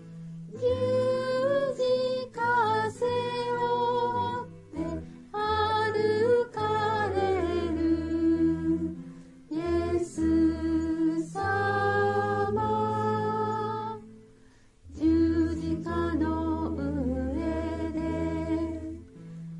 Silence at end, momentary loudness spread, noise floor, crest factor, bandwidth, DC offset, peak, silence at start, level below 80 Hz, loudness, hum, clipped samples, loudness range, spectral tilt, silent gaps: 0 s; 11 LU; -57 dBFS; 14 dB; 11 kHz; under 0.1%; -14 dBFS; 0 s; -48 dBFS; -28 LUFS; none; under 0.1%; 3 LU; -7 dB/octave; none